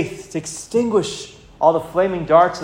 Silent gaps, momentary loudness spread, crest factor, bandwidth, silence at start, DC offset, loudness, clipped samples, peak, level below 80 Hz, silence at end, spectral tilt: none; 13 LU; 18 dB; 16 kHz; 0 s; under 0.1%; -19 LUFS; under 0.1%; 0 dBFS; -50 dBFS; 0 s; -5 dB/octave